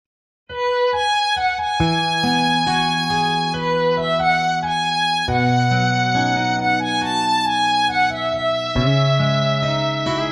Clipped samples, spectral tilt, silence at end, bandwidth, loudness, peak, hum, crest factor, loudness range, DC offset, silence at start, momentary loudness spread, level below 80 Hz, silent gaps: under 0.1%; -5 dB/octave; 0 s; 13 kHz; -18 LUFS; -6 dBFS; none; 14 dB; 0 LU; under 0.1%; 0.5 s; 3 LU; -42 dBFS; none